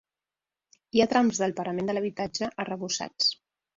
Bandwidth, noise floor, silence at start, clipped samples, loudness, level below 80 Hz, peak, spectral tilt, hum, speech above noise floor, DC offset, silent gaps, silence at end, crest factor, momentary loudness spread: 7.8 kHz; under -90 dBFS; 0.95 s; under 0.1%; -27 LUFS; -66 dBFS; -8 dBFS; -3.5 dB/octave; none; over 63 dB; under 0.1%; none; 0.4 s; 20 dB; 8 LU